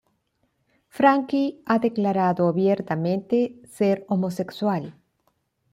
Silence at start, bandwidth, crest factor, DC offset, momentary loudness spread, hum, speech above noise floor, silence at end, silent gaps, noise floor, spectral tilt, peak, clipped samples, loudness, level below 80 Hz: 0.95 s; 14.5 kHz; 20 dB; under 0.1%; 7 LU; none; 49 dB; 0.8 s; none; -71 dBFS; -8 dB/octave; -4 dBFS; under 0.1%; -23 LUFS; -68 dBFS